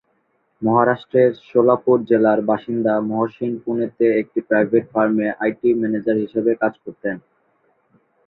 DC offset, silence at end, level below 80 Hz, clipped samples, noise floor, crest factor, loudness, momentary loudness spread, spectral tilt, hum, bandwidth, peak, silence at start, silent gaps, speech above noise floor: under 0.1%; 1.1 s; -64 dBFS; under 0.1%; -66 dBFS; 18 dB; -19 LUFS; 8 LU; -10.5 dB/octave; none; 4.2 kHz; -2 dBFS; 0.6 s; none; 48 dB